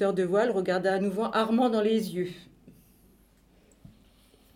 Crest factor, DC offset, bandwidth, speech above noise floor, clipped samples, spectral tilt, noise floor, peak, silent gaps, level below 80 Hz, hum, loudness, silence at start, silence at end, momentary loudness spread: 16 dB; under 0.1%; 16.5 kHz; 34 dB; under 0.1%; -6.5 dB/octave; -61 dBFS; -12 dBFS; none; -64 dBFS; none; -27 LUFS; 0 s; 1.85 s; 9 LU